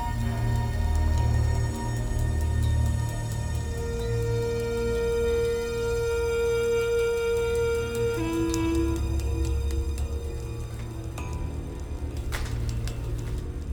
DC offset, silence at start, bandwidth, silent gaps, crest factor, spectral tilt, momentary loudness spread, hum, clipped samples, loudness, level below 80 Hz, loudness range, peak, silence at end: under 0.1%; 0 s; 19.5 kHz; none; 16 dB; -6.5 dB/octave; 9 LU; none; under 0.1%; -28 LUFS; -32 dBFS; 7 LU; -10 dBFS; 0 s